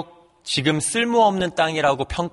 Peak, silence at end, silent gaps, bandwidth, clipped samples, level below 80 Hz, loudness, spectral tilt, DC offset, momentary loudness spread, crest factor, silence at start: -4 dBFS; 0.05 s; none; 11.5 kHz; under 0.1%; -46 dBFS; -20 LUFS; -4 dB/octave; under 0.1%; 9 LU; 16 dB; 0 s